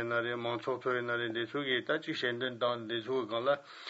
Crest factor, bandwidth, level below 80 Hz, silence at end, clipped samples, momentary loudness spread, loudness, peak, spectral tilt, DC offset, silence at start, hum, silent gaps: 16 dB; 8 kHz; -86 dBFS; 0 s; under 0.1%; 3 LU; -34 LUFS; -18 dBFS; -5.5 dB/octave; under 0.1%; 0 s; none; none